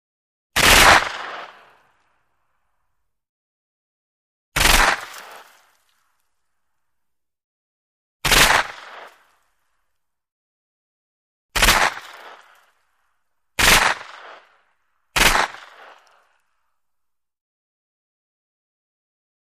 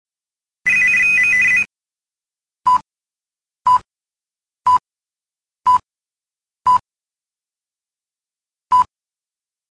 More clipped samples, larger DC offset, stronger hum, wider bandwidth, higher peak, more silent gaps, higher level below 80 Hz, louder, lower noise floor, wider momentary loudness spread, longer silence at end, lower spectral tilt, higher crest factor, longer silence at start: neither; neither; neither; first, 15.5 kHz vs 11 kHz; first, 0 dBFS vs -6 dBFS; first, 3.29-4.52 s, 7.44-8.20 s, 10.32-11.49 s vs none; first, -34 dBFS vs -56 dBFS; about the same, -15 LUFS vs -15 LUFS; second, -81 dBFS vs under -90 dBFS; first, 23 LU vs 10 LU; first, 3.95 s vs 0.85 s; about the same, -1 dB/octave vs -1 dB/octave; first, 22 dB vs 14 dB; about the same, 0.55 s vs 0.65 s